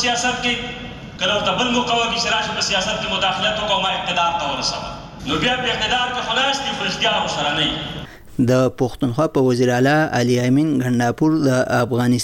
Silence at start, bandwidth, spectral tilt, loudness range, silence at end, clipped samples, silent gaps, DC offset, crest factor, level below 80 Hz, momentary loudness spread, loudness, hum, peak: 0 s; 16.5 kHz; -4 dB/octave; 2 LU; 0 s; under 0.1%; none; under 0.1%; 12 dB; -44 dBFS; 6 LU; -18 LUFS; none; -6 dBFS